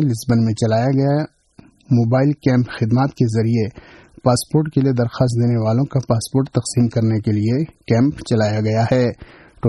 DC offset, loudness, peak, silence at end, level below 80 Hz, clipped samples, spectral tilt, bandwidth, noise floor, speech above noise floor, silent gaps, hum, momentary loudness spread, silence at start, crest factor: under 0.1%; -18 LUFS; -2 dBFS; 0 s; -48 dBFS; under 0.1%; -7 dB/octave; 12 kHz; -48 dBFS; 32 dB; none; none; 4 LU; 0 s; 14 dB